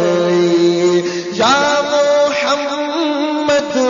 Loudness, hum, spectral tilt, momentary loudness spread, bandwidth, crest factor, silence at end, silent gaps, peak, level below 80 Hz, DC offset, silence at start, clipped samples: -14 LUFS; none; -4 dB/octave; 5 LU; 7.4 kHz; 12 dB; 0 s; none; -2 dBFS; -58 dBFS; under 0.1%; 0 s; under 0.1%